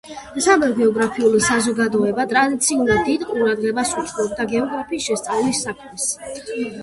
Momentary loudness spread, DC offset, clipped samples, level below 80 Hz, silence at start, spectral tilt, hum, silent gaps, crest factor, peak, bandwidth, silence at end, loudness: 9 LU; under 0.1%; under 0.1%; -50 dBFS; 0.05 s; -3.5 dB/octave; none; none; 16 dB; -2 dBFS; 12 kHz; 0 s; -19 LUFS